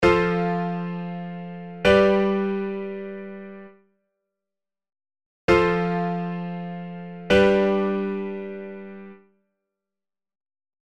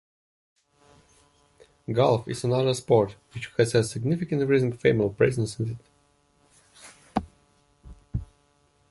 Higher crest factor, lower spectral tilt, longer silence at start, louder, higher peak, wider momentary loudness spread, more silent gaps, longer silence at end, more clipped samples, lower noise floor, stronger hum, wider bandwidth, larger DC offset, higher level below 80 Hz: about the same, 20 dB vs 22 dB; about the same, -7 dB/octave vs -6.5 dB/octave; second, 0 s vs 1.9 s; about the same, -23 LUFS vs -25 LUFS; about the same, -4 dBFS vs -6 dBFS; first, 19 LU vs 14 LU; first, 5.26-5.48 s vs none; first, 1.8 s vs 0.65 s; neither; first, under -90 dBFS vs -65 dBFS; neither; second, 10 kHz vs 11.5 kHz; first, 0.2% vs under 0.1%; about the same, -48 dBFS vs -50 dBFS